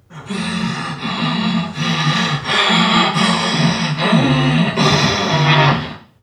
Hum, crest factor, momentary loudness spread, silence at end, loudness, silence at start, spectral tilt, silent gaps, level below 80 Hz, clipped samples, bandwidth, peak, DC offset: none; 14 dB; 10 LU; 0.25 s; -15 LUFS; 0.1 s; -5 dB/octave; none; -46 dBFS; under 0.1%; 10.5 kHz; 0 dBFS; under 0.1%